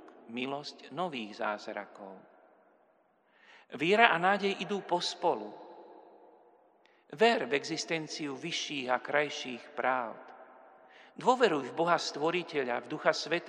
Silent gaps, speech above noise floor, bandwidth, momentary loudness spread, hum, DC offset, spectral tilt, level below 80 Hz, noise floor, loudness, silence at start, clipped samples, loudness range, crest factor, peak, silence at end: none; 37 dB; 10.5 kHz; 19 LU; none; under 0.1%; -3.5 dB/octave; under -90 dBFS; -69 dBFS; -31 LUFS; 0 s; under 0.1%; 5 LU; 30 dB; -4 dBFS; 0 s